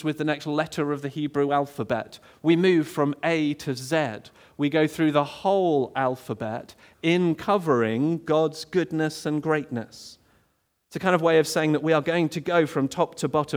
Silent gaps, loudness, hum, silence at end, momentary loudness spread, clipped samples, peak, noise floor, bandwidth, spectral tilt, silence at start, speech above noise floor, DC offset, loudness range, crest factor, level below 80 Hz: none; -24 LUFS; none; 0 s; 10 LU; under 0.1%; -6 dBFS; -70 dBFS; over 20 kHz; -6 dB/octave; 0 s; 46 dB; under 0.1%; 2 LU; 18 dB; -66 dBFS